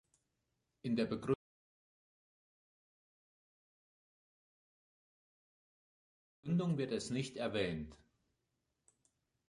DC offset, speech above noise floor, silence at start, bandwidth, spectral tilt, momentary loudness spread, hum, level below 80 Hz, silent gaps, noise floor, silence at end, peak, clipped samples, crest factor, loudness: under 0.1%; 49 dB; 0.85 s; 11 kHz; -6.5 dB/octave; 11 LU; none; -70 dBFS; 1.35-6.43 s; -86 dBFS; 1.55 s; -22 dBFS; under 0.1%; 22 dB; -39 LUFS